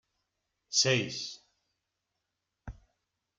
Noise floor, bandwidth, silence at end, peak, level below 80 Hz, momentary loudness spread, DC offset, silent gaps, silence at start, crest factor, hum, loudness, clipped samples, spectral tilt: -85 dBFS; 11 kHz; 0.65 s; -14 dBFS; -60 dBFS; 25 LU; under 0.1%; none; 0.7 s; 24 dB; none; -28 LUFS; under 0.1%; -2.5 dB/octave